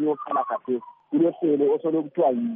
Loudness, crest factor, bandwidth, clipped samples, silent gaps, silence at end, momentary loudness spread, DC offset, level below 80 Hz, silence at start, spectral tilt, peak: -24 LUFS; 12 dB; 3.7 kHz; under 0.1%; none; 0 s; 7 LU; under 0.1%; -80 dBFS; 0 s; -7.5 dB/octave; -10 dBFS